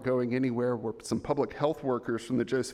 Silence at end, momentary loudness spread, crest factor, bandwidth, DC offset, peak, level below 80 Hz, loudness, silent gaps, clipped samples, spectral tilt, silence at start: 0 s; 4 LU; 16 dB; 14 kHz; under 0.1%; -14 dBFS; -60 dBFS; -31 LUFS; none; under 0.1%; -6.5 dB/octave; 0 s